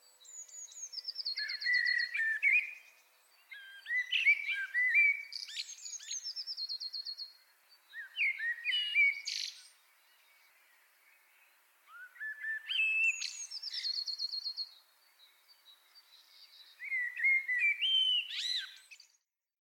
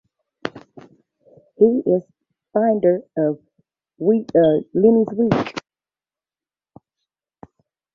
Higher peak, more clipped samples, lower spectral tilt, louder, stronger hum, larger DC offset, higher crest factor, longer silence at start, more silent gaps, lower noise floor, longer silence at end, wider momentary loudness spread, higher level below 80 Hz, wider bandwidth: second, -18 dBFS vs -2 dBFS; neither; second, 8 dB/octave vs -8.5 dB/octave; second, -32 LUFS vs -18 LUFS; neither; neither; about the same, 18 dB vs 20 dB; second, 0.25 s vs 0.45 s; neither; second, -77 dBFS vs under -90 dBFS; second, 0.65 s vs 2.35 s; first, 20 LU vs 16 LU; second, under -90 dBFS vs -58 dBFS; first, 17.5 kHz vs 7 kHz